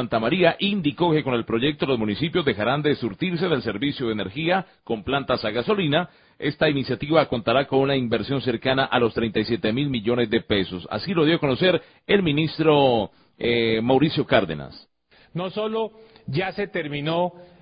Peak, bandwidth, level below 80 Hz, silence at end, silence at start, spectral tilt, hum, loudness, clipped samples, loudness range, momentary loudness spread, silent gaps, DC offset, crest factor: -2 dBFS; 5.2 kHz; -50 dBFS; 0.15 s; 0 s; -11 dB/octave; none; -23 LUFS; under 0.1%; 3 LU; 9 LU; none; under 0.1%; 20 dB